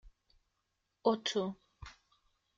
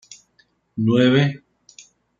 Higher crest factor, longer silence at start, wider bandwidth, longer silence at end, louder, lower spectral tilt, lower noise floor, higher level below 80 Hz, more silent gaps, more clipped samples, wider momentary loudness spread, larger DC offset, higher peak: first, 24 dB vs 18 dB; second, 0.05 s vs 0.75 s; first, 8.8 kHz vs 7.6 kHz; second, 0.65 s vs 0.85 s; second, -35 LUFS vs -18 LUFS; second, -4.5 dB/octave vs -7 dB/octave; first, -83 dBFS vs -62 dBFS; about the same, -64 dBFS vs -62 dBFS; neither; neither; about the same, 22 LU vs 20 LU; neither; second, -16 dBFS vs -4 dBFS